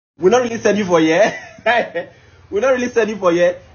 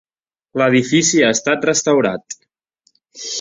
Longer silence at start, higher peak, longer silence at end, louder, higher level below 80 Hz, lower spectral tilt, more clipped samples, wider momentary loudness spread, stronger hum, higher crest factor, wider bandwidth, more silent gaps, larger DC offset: second, 0.2 s vs 0.55 s; about the same, 0 dBFS vs -2 dBFS; first, 0.15 s vs 0 s; about the same, -16 LUFS vs -15 LUFS; about the same, -54 dBFS vs -58 dBFS; about the same, -3.5 dB/octave vs -3.5 dB/octave; neither; second, 10 LU vs 17 LU; neither; about the same, 16 dB vs 16 dB; second, 7 kHz vs 7.8 kHz; neither; neither